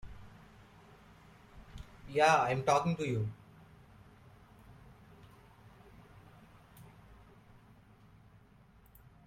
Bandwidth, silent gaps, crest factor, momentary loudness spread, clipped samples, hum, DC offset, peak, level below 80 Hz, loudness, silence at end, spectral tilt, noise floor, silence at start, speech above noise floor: 16.5 kHz; none; 24 dB; 31 LU; under 0.1%; none; under 0.1%; -14 dBFS; -62 dBFS; -31 LUFS; 2.45 s; -5 dB/octave; -62 dBFS; 0.05 s; 32 dB